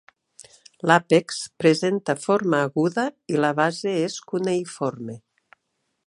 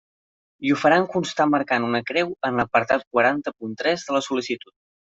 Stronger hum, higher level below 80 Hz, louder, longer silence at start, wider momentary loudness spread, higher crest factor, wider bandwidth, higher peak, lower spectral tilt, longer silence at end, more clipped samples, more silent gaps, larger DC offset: neither; second, -72 dBFS vs -64 dBFS; about the same, -22 LUFS vs -22 LUFS; first, 0.85 s vs 0.6 s; about the same, 9 LU vs 9 LU; about the same, 22 dB vs 18 dB; first, 11.5 kHz vs 7.8 kHz; about the same, -2 dBFS vs -4 dBFS; about the same, -5 dB/octave vs -5 dB/octave; first, 0.9 s vs 0.6 s; neither; second, none vs 3.07-3.11 s; neither